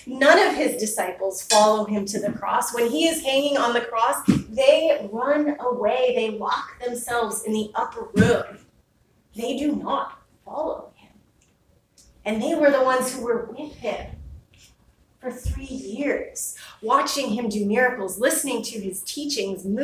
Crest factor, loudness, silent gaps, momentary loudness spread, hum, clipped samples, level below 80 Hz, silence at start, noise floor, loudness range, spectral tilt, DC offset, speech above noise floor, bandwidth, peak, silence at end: 22 dB; -23 LUFS; none; 14 LU; none; under 0.1%; -46 dBFS; 0.05 s; -62 dBFS; 10 LU; -4 dB/octave; under 0.1%; 40 dB; 16 kHz; -2 dBFS; 0 s